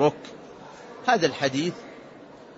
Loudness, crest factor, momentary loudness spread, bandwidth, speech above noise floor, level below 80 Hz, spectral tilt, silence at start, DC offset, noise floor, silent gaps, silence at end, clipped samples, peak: -25 LUFS; 22 dB; 22 LU; 8 kHz; 21 dB; -68 dBFS; -4.5 dB/octave; 0 s; under 0.1%; -46 dBFS; none; 0.05 s; under 0.1%; -6 dBFS